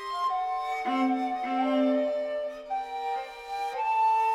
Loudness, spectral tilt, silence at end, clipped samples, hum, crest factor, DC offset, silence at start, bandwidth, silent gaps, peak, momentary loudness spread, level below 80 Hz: -29 LUFS; -3.5 dB/octave; 0 s; under 0.1%; none; 12 dB; under 0.1%; 0 s; 13 kHz; none; -16 dBFS; 9 LU; -66 dBFS